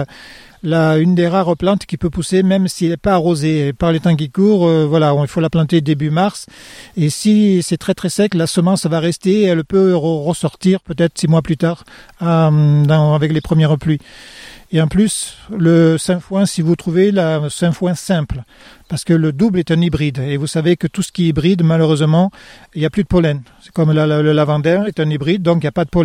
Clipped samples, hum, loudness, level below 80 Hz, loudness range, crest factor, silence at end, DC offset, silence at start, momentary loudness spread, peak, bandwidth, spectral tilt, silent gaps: under 0.1%; none; -15 LUFS; -40 dBFS; 2 LU; 12 dB; 0 s; under 0.1%; 0 s; 7 LU; -2 dBFS; 13.5 kHz; -6.5 dB/octave; none